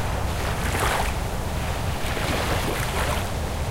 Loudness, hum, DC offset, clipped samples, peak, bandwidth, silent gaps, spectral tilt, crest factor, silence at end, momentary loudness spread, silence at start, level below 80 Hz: -26 LUFS; none; under 0.1%; under 0.1%; -10 dBFS; 16 kHz; none; -4.5 dB/octave; 14 dB; 0 s; 5 LU; 0 s; -30 dBFS